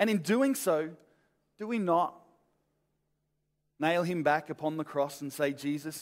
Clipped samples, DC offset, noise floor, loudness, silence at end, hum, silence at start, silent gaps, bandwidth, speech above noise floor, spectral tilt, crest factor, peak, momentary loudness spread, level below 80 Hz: under 0.1%; under 0.1%; -79 dBFS; -31 LUFS; 0 s; none; 0 s; none; 16 kHz; 49 dB; -5 dB/octave; 20 dB; -12 dBFS; 8 LU; -80 dBFS